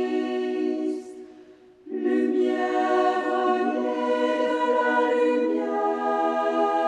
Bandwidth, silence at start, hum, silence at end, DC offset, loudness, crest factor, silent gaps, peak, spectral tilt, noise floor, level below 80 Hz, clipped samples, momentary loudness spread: 10 kHz; 0 s; none; 0 s; under 0.1%; -24 LUFS; 14 dB; none; -10 dBFS; -4 dB/octave; -50 dBFS; -74 dBFS; under 0.1%; 7 LU